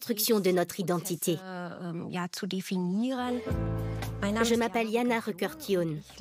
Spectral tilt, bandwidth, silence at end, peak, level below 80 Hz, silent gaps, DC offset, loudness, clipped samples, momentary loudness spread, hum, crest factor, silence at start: -5 dB/octave; 16 kHz; 0 s; -14 dBFS; -48 dBFS; none; under 0.1%; -30 LUFS; under 0.1%; 9 LU; none; 16 dB; 0 s